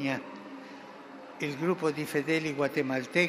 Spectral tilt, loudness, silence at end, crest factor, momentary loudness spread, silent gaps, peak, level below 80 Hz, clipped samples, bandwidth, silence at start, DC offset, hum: -5.5 dB/octave; -31 LUFS; 0 s; 20 dB; 18 LU; none; -12 dBFS; -78 dBFS; under 0.1%; 15.5 kHz; 0 s; under 0.1%; none